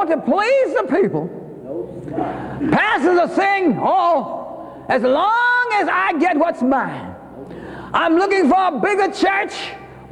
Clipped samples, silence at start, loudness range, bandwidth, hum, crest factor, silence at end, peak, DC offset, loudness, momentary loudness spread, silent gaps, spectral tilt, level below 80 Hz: under 0.1%; 0 s; 2 LU; 11 kHz; none; 14 dB; 0 s; -4 dBFS; under 0.1%; -17 LUFS; 17 LU; none; -5.5 dB/octave; -52 dBFS